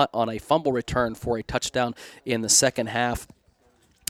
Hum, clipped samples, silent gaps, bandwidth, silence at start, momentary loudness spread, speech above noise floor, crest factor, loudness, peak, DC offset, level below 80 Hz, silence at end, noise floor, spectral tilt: none; under 0.1%; none; 18 kHz; 0 s; 11 LU; 37 dB; 22 dB; -24 LUFS; -4 dBFS; under 0.1%; -46 dBFS; 0.85 s; -62 dBFS; -3 dB/octave